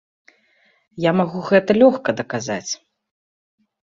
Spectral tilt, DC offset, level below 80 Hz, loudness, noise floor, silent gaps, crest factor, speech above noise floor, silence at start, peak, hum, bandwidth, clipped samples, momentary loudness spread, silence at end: -5.5 dB/octave; under 0.1%; -62 dBFS; -19 LUFS; -60 dBFS; none; 20 dB; 43 dB; 0.95 s; -2 dBFS; none; 7.6 kHz; under 0.1%; 12 LU; 1.2 s